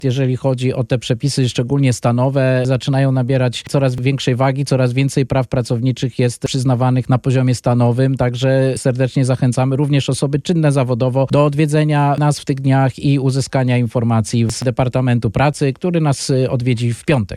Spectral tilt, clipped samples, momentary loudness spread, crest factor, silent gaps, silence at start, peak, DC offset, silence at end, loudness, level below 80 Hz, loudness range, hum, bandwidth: -6.5 dB/octave; under 0.1%; 3 LU; 12 dB; none; 0 s; -2 dBFS; under 0.1%; 0 s; -16 LUFS; -44 dBFS; 1 LU; none; 12 kHz